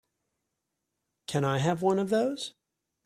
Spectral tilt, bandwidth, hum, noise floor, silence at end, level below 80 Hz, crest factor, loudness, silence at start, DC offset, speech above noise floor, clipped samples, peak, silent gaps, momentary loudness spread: -6 dB/octave; 14.5 kHz; none; -84 dBFS; 0.55 s; -68 dBFS; 18 dB; -28 LUFS; 1.3 s; under 0.1%; 56 dB; under 0.1%; -12 dBFS; none; 13 LU